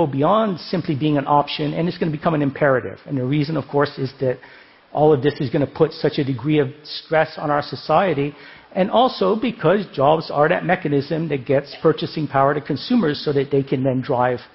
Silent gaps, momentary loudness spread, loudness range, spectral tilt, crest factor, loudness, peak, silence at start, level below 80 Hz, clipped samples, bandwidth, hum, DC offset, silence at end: none; 6 LU; 2 LU; -10.5 dB/octave; 18 dB; -20 LUFS; -2 dBFS; 0 s; -54 dBFS; under 0.1%; 5.8 kHz; none; under 0.1%; 0.1 s